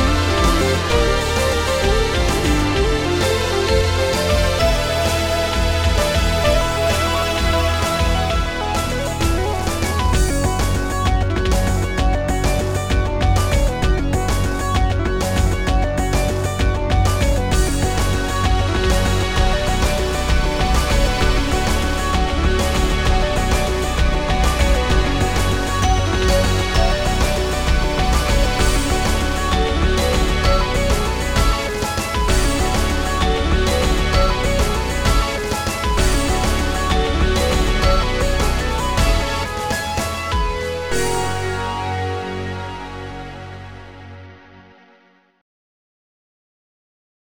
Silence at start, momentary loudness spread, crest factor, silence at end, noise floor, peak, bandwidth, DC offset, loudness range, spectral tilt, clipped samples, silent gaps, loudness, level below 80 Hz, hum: 0 s; 4 LU; 14 dB; 1.95 s; -54 dBFS; -2 dBFS; 17.5 kHz; 1%; 3 LU; -4.5 dB/octave; under 0.1%; none; -18 LUFS; -20 dBFS; none